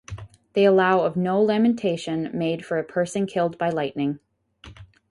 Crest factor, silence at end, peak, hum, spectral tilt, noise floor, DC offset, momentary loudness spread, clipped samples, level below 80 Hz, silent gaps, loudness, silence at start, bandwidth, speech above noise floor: 16 dB; 0.25 s; -6 dBFS; none; -6.5 dB/octave; -48 dBFS; under 0.1%; 10 LU; under 0.1%; -56 dBFS; none; -23 LUFS; 0.1 s; 11.5 kHz; 26 dB